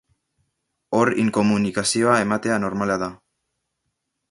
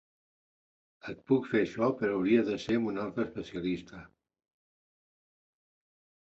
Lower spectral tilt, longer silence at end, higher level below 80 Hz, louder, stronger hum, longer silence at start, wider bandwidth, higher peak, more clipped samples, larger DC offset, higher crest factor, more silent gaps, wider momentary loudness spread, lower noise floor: second, -4.5 dB/octave vs -7 dB/octave; second, 1.15 s vs 2.25 s; first, -56 dBFS vs -66 dBFS; first, -21 LUFS vs -31 LUFS; neither; second, 0.9 s vs 1.05 s; first, 11.5 kHz vs 7.8 kHz; first, -2 dBFS vs -14 dBFS; neither; neither; about the same, 20 dB vs 20 dB; neither; second, 6 LU vs 17 LU; second, -77 dBFS vs under -90 dBFS